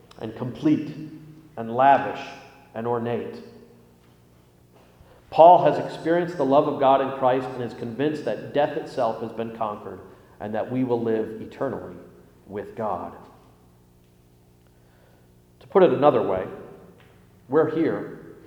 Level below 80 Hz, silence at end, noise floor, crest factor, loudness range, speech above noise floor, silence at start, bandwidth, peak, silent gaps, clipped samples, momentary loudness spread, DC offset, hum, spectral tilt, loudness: -62 dBFS; 0.15 s; -56 dBFS; 24 dB; 14 LU; 34 dB; 0.2 s; 11 kHz; -2 dBFS; none; under 0.1%; 20 LU; under 0.1%; 60 Hz at -55 dBFS; -7.5 dB/octave; -23 LUFS